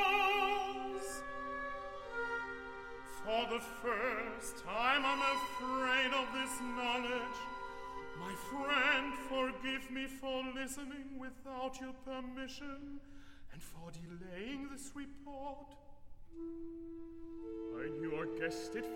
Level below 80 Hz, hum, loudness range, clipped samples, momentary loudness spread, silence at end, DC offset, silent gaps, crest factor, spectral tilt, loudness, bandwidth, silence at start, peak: -60 dBFS; none; 13 LU; under 0.1%; 17 LU; 0 s; under 0.1%; none; 22 dB; -3 dB/octave; -39 LUFS; 16.5 kHz; 0 s; -18 dBFS